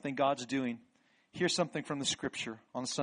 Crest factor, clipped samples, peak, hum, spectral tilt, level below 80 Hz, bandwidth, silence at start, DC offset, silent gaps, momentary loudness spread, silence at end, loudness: 18 dB; under 0.1%; -18 dBFS; none; -3.5 dB/octave; -74 dBFS; 10 kHz; 0.05 s; under 0.1%; none; 9 LU; 0 s; -35 LUFS